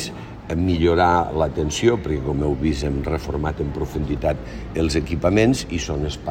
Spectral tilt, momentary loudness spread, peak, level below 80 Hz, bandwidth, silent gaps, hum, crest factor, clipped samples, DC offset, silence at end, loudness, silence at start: -6 dB/octave; 9 LU; -4 dBFS; -34 dBFS; 16 kHz; none; none; 18 dB; under 0.1%; under 0.1%; 0 s; -21 LUFS; 0 s